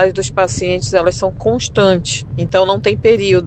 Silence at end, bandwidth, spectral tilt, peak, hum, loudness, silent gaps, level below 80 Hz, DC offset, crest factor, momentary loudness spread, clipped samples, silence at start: 0 s; 9 kHz; -5 dB/octave; 0 dBFS; none; -13 LUFS; none; -36 dBFS; under 0.1%; 12 dB; 5 LU; under 0.1%; 0 s